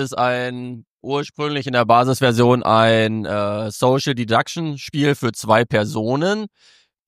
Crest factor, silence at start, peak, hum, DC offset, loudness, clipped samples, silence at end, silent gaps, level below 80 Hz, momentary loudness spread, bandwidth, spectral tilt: 18 dB; 0 s; -2 dBFS; none; under 0.1%; -18 LUFS; under 0.1%; 0.6 s; 0.89-0.99 s; -58 dBFS; 11 LU; 15.5 kHz; -5.5 dB/octave